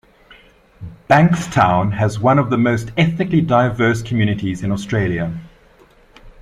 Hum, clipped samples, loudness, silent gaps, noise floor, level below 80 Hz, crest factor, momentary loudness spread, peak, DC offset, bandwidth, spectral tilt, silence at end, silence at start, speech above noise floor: none; under 0.1%; -16 LUFS; none; -49 dBFS; -44 dBFS; 16 dB; 10 LU; 0 dBFS; under 0.1%; 12 kHz; -7 dB/octave; 0.1 s; 0.8 s; 33 dB